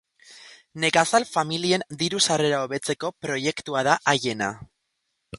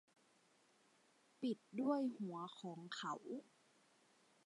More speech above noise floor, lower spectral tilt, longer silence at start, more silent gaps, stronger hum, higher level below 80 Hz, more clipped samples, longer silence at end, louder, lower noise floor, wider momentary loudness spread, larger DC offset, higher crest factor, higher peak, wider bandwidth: first, 53 dB vs 30 dB; second, -3 dB/octave vs -5.5 dB/octave; second, 0.3 s vs 1.4 s; neither; neither; first, -62 dBFS vs under -90 dBFS; neither; second, 0 s vs 1.05 s; first, -23 LUFS vs -46 LUFS; about the same, -77 dBFS vs -75 dBFS; second, 9 LU vs 12 LU; neither; about the same, 22 dB vs 22 dB; first, -2 dBFS vs -26 dBFS; about the same, 11.5 kHz vs 11.5 kHz